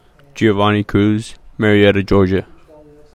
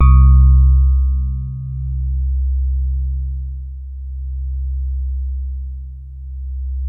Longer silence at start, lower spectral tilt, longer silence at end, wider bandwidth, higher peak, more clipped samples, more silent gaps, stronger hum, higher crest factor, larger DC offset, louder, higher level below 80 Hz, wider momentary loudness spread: first, 0.35 s vs 0 s; second, -7 dB/octave vs -12 dB/octave; first, 0.75 s vs 0 s; first, 11 kHz vs 2.6 kHz; about the same, 0 dBFS vs 0 dBFS; neither; neither; neither; about the same, 16 dB vs 14 dB; neither; first, -15 LUFS vs -18 LUFS; second, -38 dBFS vs -16 dBFS; second, 9 LU vs 19 LU